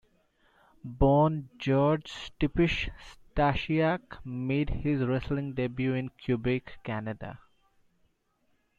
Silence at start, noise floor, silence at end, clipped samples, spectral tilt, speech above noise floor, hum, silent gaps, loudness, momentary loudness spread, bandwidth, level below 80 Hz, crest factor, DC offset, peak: 0.85 s; -72 dBFS; 1.4 s; under 0.1%; -8 dB/octave; 44 dB; none; none; -29 LUFS; 13 LU; 7.8 kHz; -44 dBFS; 18 dB; under 0.1%; -12 dBFS